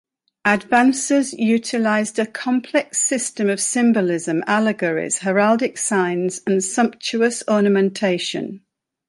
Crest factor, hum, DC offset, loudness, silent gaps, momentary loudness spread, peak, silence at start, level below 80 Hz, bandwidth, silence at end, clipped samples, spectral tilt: 18 dB; none; under 0.1%; -19 LUFS; none; 6 LU; -2 dBFS; 0.45 s; -66 dBFS; 11.5 kHz; 0.5 s; under 0.1%; -4 dB/octave